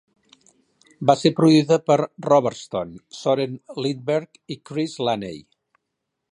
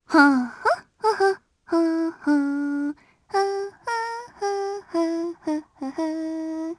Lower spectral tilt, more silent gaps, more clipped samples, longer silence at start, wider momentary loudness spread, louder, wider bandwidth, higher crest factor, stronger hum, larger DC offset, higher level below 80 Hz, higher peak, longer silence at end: first, -6 dB/octave vs -4 dB/octave; neither; neither; first, 1 s vs 0.1 s; first, 16 LU vs 9 LU; first, -21 LUFS vs -25 LUFS; about the same, 10.5 kHz vs 11 kHz; about the same, 20 dB vs 22 dB; neither; neither; about the same, -64 dBFS vs -68 dBFS; about the same, -2 dBFS vs -2 dBFS; first, 0.95 s vs 0.05 s